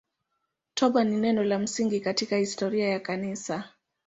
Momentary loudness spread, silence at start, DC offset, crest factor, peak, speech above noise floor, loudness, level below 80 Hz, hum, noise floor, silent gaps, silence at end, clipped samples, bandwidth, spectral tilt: 10 LU; 0.75 s; under 0.1%; 18 dB; -10 dBFS; 54 dB; -27 LUFS; -70 dBFS; none; -80 dBFS; none; 0.4 s; under 0.1%; 8 kHz; -4.5 dB/octave